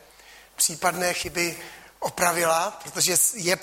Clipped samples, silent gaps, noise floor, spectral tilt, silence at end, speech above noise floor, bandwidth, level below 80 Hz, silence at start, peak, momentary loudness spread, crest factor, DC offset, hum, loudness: under 0.1%; none; -50 dBFS; -1.5 dB/octave; 0 s; 26 dB; 16.5 kHz; -58 dBFS; 0.3 s; -6 dBFS; 14 LU; 20 dB; under 0.1%; none; -23 LUFS